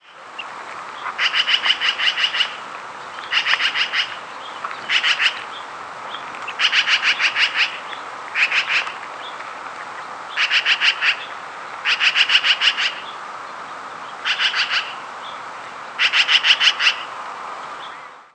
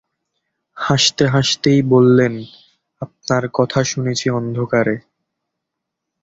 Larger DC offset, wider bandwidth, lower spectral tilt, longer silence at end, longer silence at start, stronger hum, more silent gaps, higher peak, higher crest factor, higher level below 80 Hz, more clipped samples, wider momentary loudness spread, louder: neither; first, 11 kHz vs 8 kHz; second, 1.5 dB/octave vs -5 dB/octave; second, 0.1 s vs 1.25 s; second, 0.05 s vs 0.75 s; neither; neither; about the same, 0 dBFS vs -2 dBFS; first, 22 dB vs 16 dB; second, -72 dBFS vs -52 dBFS; neither; first, 18 LU vs 15 LU; about the same, -17 LUFS vs -16 LUFS